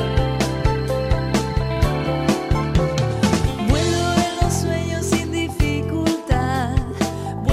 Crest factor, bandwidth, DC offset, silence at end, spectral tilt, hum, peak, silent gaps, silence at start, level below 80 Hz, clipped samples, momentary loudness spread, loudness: 14 dB; 15.5 kHz; under 0.1%; 0 s; -5.5 dB/octave; none; -6 dBFS; none; 0 s; -28 dBFS; under 0.1%; 4 LU; -21 LUFS